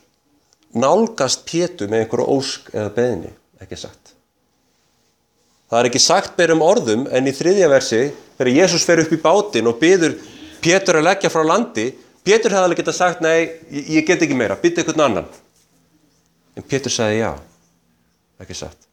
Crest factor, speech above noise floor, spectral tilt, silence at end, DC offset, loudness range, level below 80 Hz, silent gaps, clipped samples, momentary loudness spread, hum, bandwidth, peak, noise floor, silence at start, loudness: 16 dB; 47 dB; -3.5 dB/octave; 0.25 s; under 0.1%; 9 LU; -54 dBFS; none; under 0.1%; 15 LU; none; 15.5 kHz; 0 dBFS; -64 dBFS; 0.75 s; -16 LUFS